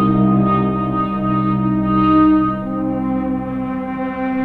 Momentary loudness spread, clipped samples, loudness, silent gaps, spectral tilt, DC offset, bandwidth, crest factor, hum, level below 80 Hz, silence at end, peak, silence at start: 10 LU; under 0.1%; -17 LUFS; none; -10.5 dB/octave; under 0.1%; 4.3 kHz; 12 dB; none; -38 dBFS; 0 s; -4 dBFS; 0 s